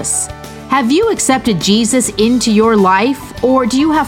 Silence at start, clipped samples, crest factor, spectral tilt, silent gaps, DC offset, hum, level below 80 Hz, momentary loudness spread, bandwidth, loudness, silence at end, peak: 0 s; under 0.1%; 12 dB; -4 dB/octave; none; under 0.1%; none; -38 dBFS; 7 LU; 17 kHz; -12 LUFS; 0 s; 0 dBFS